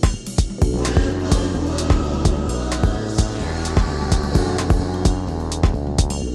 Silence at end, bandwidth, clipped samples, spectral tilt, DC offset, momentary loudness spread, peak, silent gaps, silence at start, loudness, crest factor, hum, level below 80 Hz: 0 s; 12.5 kHz; under 0.1%; -6 dB/octave; under 0.1%; 4 LU; -2 dBFS; none; 0 s; -21 LUFS; 18 dB; none; -22 dBFS